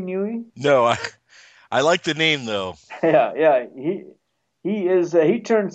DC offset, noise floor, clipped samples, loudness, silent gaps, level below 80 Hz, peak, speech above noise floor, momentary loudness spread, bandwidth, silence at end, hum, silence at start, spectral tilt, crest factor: under 0.1%; -51 dBFS; under 0.1%; -20 LUFS; none; -66 dBFS; -4 dBFS; 31 dB; 10 LU; 8.8 kHz; 0.05 s; none; 0 s; -5 dB/octave; 18 dB